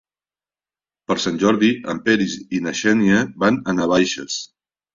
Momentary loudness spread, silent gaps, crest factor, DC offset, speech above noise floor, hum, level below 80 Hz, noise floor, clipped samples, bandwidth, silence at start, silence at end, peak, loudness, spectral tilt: 9 LU; none; 18 dB; under 0.1%; over 72 dB; none; -54 dBFS; under -90 dBFS; under 0.1%; 7.6 kHz; 1.1 s; 0.5 s; -2 dBFS; -19 LUFS; -4.5 dB/octave